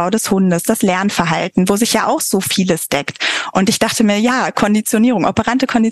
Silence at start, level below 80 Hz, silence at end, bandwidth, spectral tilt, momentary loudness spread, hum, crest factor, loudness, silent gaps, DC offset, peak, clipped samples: 0 s; -48 dBFS; 0 s; 13 kHz; -4 dB/octave; 3 LU; none; 12 dB; -15 LUFS; none; 0.2%; -2 dBFS; under 0.1%